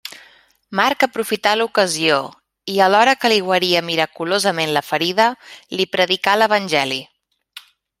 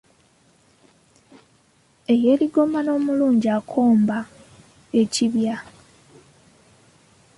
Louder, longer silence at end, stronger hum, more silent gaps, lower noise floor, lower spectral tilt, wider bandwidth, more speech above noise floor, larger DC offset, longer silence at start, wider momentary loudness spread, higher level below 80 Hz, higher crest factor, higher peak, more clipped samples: first, -17 LUFS vs -20 LUFS; second, 0.4 s vs 1.75 s; neither; neither; second, -51 dBFS vs -59 dBFS; second, -3 dB/octave vs -5.5 dB/octave; first, 16 kHz vs 11.5 kHz; second, 34 dB vs 40 dB; neither; second, 0.05 s vs 2.1 s; about the same, 10 LU vs 10 LU; about the same, -66 dBFS vs -64 dBFS; about the same, 18 dB vs 16 dB; first, -2 dBFS vs -6 dBFS; neither